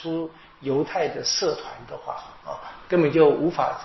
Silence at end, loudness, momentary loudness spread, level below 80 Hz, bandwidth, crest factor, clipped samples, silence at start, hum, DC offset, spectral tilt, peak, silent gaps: 0 s; -23 LUFS; 18 LU; -58 dBFS; 6.2 kHz; 20 dB; under 0.1%; 0 s; none; under 0.1%; -4 dB/octave; -4 dBFS; none